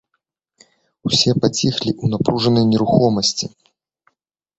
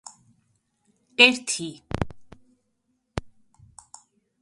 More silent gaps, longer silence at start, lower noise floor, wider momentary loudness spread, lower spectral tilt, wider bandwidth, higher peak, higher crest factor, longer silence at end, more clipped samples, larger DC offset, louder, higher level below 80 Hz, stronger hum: neither; second, 1.05 s vs 1.2 s; about the same, -74 dBFS vs -74 dBFS; second, 7 LU vs 21 LU; first, -5 dB/octave vs -2.5 dB/octave; second, 8.2 kHz vs 11.5 kHz; about the same, 0 dBFS vs -2 dBFS; second, 18 dB vs 28 dB; about the same, 1.1 s vs 1.15 s; neither; neither; first, -17 LUFS vs -21 LUFS; about the same, -50 dBFS vs -48 dBFS; neither